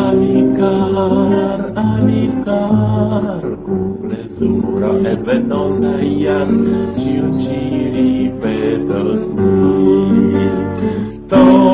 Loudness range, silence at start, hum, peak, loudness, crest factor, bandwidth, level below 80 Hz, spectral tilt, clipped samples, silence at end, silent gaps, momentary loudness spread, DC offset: 2 LU; 0 s; none; 0 dBFS; -15 LUFS; 14 dB; 4 kHz; -38 dBFS; -12.5 dB/octave; under 0.1%; 0 s; none; 7 LU; under 0.1%